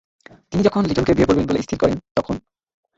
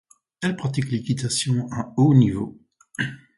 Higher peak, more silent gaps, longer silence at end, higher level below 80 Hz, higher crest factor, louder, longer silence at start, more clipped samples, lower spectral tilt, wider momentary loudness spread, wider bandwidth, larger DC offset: about the same, -2 dBFS vs -4 dBFS; first, 2.11-2.15 s vs none; first, 0.6 s vs 0.2 s; first, -40 dBFS vs -52 dBFS; about the same, 18 dB vs 18 dB; first, -19 LUFS vs -22 LUFS; about the same, 0.5 s vs 0.4 s; neither; first, -7 dB/octave vs -5.5 dB/octave; second, 9 LU vs 13 LU; second, 8 kHz vs 11.5 kHz; neither